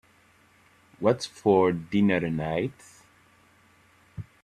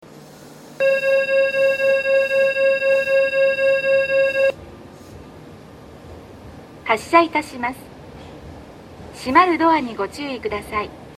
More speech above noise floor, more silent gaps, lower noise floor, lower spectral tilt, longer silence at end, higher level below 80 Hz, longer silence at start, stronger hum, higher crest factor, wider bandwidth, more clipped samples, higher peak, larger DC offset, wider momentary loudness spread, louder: first, 36 dB vs 22 dB; neither; first, -60 dBFS vs -42 dBFS; first, -6.5 dB/octave vs -4.5 dB/octave; first, 0.2 s vs 0.05 s; second, -60 dBFS vs -52 dBFS; first, 1 s vs 0.15 s; neither; about the same, 20 dB vs 20 dB; about the same, 12 kHz vs 13 kHz; neither; second, -8 dBFS vs 0 dBFS; neither; second, 20 LU vs 23 LU; second, -25 LUFS vs -18 LUFS